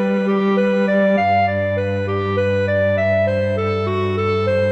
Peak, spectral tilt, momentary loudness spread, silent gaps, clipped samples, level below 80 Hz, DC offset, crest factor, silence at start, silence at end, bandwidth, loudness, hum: -6 dBFS; -8 dB/octave; 4 LU; none; under 0.1%; -56 dBFS; under 0.1%; 12 dB; 0 s; 0 s; 7.8 kHz; -18 LUFS; none